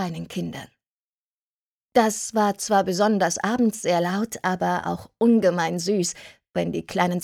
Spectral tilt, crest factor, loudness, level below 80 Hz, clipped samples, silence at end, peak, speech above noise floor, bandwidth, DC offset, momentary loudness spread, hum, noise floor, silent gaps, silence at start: -4.5 dB/octave; 20 dB; -23 LUFS; -60 dBFS; under 0.1%; 0 s; -4 dBFS; over 67 dB; 16 kHz; under 0.1%; 11 LU; none; under -90 dBFS; 0.91-1.86 s; 0 s